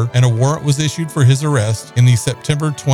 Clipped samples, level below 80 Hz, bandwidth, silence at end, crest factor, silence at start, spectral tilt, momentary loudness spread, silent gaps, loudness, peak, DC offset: under 0.1%; -48 dBFS; 13.5 kHz; 0 s; 12 dB; 0 s; -5.5 dB/octave; 6 LU; none; -15 LUFS; -2 dBFS; under 0.1%